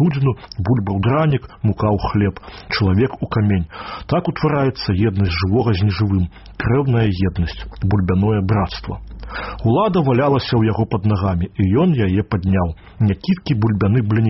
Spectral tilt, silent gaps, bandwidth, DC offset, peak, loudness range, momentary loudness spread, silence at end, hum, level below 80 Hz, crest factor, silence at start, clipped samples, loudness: -7 dB/octave; none; 6 kHz; under 0.1%; -4 dBFS; 2 LU; 8 LU; 0 s; none; -36 dBFS; 12 dB; 0 s; under 0.1%; -18 LUFS